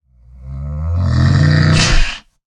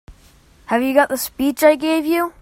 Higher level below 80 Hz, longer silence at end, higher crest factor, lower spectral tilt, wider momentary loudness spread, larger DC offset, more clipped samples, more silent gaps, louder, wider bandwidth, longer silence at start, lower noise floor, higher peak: first, -22 dBFS vs -50 dBFS; first, 0.4 s vs 0.1 s; second, 12 dB vs 18 dB; first, -5 dB/octave vs -3 dB/octave; first, 17 LU vs 6 LU; neither; neither; neither; first, -14 LUFS vs -17 LUFS; second, 10 kHz vs 16.5 kHz; first, 0.4 s vs 0.1 s; second, -36 dBFS vs -50 dBFS; about the same, 0 dBFS vs 0 dBFS